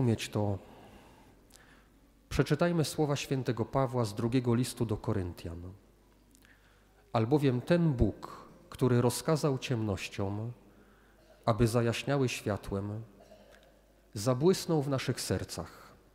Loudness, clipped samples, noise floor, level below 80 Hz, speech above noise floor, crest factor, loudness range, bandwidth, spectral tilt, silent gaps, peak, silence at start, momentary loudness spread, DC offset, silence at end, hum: -31 LUFS; under 0.1%; -62 dBFS; -52 dBFS; 32 dB; 22 dB; 4 LU; 16 kHz; -6 dB/octave; none; -10 dBFS; 0 s; 15 LU; under 0.1%; 0.25 s; none